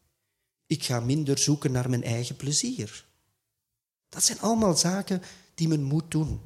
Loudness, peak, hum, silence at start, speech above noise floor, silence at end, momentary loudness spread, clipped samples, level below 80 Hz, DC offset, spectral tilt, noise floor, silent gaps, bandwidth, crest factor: -26 LUFS; -8 dBFS; none; 0.7 s; 59 dB; 0 s; 11 LU; under 0.1%; -52 dBFS; under 0.1%; -4.5 dB/octave; -85 dBFS; none; 15.5 kHz; 20 dB